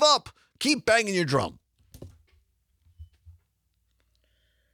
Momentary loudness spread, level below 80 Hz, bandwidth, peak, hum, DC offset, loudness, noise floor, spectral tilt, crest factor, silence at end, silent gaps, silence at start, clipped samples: 7 LU; -60 dBFS; 18.5 kHz; -6 dBFS; none; under 0.1%; -24 LUFS; -73 dBFS; -3.5 dB/octave; 22 dB; 1.45 s; none; 0 s; under 0.1%